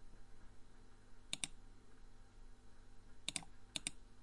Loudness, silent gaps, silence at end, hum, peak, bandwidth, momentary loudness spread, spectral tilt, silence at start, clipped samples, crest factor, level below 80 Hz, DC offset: -47 LUFS; none; 0 s; 50 Hz at -70 dBFS; -22 dBFS; 11.5 kHz; 22 LU; -0.5 dB/octave; 0 s; under 0.1%; 30 dB; -60 dBFS; under 0.1%